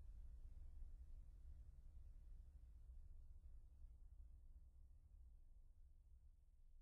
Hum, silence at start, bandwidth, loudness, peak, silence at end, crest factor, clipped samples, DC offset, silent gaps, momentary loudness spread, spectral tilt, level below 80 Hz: none; 0 s; 2 kHz; -66 LUFS; -46 dBFS; 0 s; 14 dB; under 0.1%; under 0.1%; none; 5 LU; -10.5 dB/octave; -60 dBFS